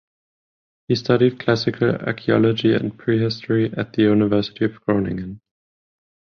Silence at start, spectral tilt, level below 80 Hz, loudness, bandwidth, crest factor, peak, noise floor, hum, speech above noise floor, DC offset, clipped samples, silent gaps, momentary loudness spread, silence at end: 0.9 s; -7.5 dB/octave; -52 dBFS; -20 LUFS; 6.8 kHz; 18 dB; -2 dBFS; under -90 dBFS; none; over 71 dB; under 0.1%; under 0.1%; none; 7 LU; 1.05 s